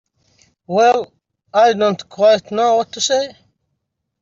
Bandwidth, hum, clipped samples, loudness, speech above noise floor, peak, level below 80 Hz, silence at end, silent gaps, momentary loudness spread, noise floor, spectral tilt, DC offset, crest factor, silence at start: 7.8 kHz; none; under 0.1%; -16 LUFS; 59 dB; -2 dBFS; -64 dBFS; 0.9 s; none; 7 LU; -74 dBFS; -3 dB/octave; under 0.1%; 14 dB; 0.7 s